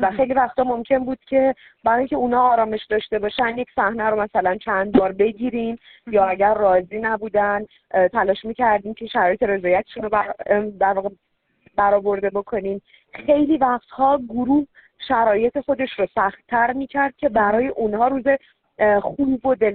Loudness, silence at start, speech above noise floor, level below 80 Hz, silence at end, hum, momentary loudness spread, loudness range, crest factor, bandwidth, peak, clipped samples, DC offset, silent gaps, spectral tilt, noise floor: -20 LUFS; 0 s; 39 dB; -52 dBFS; 0 s; none; 7 LU; 2 LU; 16 dB; 4.5 kHz; -4 dBFS; under 0.1%; under 0.1%; none; -3.5 dB/octave; -59 dBFS